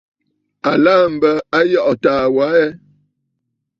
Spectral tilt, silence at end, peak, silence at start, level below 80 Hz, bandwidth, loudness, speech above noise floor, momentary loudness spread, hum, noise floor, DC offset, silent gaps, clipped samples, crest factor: -6.5 dB/octave; 1.05 s; -2 dBFS; 0.65 s; -56 dBFS; 7.4 kHz; -14 LUFS; 60 dB; 5 LU; none; -73 dBFS; under 0.1%; none; under 0.1%; 14 dB